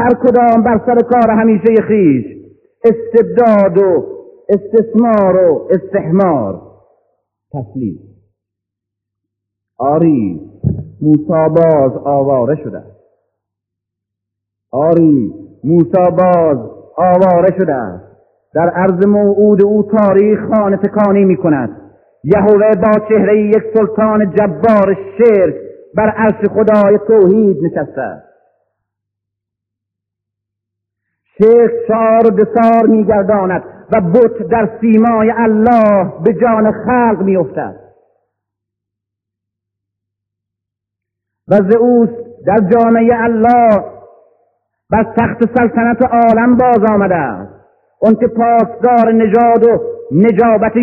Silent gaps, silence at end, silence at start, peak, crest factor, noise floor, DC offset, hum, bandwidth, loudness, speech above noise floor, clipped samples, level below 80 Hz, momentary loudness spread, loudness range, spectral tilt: none; 0 s; 0 s; 0 dBFS; 12 dB; -80 dBFS; under 0.1%; none; 4.2 kHz; -11 LUFS; 70 dB; 0.2%; -46 dBFS; 11 LU; 7 LU; -11 dB/octave